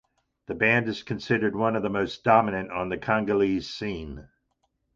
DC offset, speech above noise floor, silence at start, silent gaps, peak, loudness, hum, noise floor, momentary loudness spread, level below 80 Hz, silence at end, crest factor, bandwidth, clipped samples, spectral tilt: under 0.1%; 49 dB; 0.5 s; none; -4 dBFS; -25 LUFS; none; -74 dBFS; 12 LU; -52 dBFS; 0.7 s; 22 dB; 7.6 kHz; under 0.1%; -6.5 dB/octave